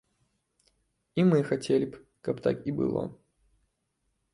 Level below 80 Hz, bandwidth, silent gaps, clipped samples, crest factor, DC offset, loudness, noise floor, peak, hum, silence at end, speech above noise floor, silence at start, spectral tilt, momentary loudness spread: -64 dBFS; 11.5 kHz; none; under 0.1%; 20 dB; under 0.1%; -29 LUFS; -78 dBFS; -12 dBFS; none; 1.2 s; 51 dB; 1.15 s; -7.5 dB/octave; 12 LU